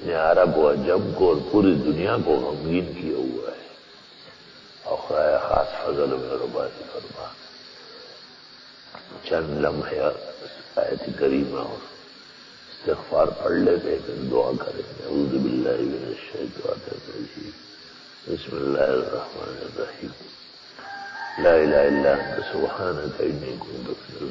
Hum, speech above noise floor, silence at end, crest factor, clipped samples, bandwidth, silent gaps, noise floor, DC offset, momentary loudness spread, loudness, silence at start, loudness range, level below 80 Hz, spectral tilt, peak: none; 24 dB; 0 s; 20 dB; under 0.1%; 7.6 kHz; none; -47 dBFS; under 0.1%; 23 LU; -24 LUFS; 0 s; 7 LU; -50 dBFS; -7.5 dB/octave; -4 dBFS